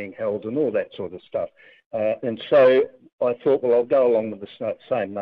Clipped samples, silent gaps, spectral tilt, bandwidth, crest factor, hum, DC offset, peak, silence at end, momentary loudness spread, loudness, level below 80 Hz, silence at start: under 0.1%; 1.86-1.91 s, 3.12-3.18 s; -8.5 dB/octave; 5 kHz; 16 dB; none; under 0.1%; -6 dBFS; 0 s; 14 LU; -22 LUFS; -72 dBFS; 0 s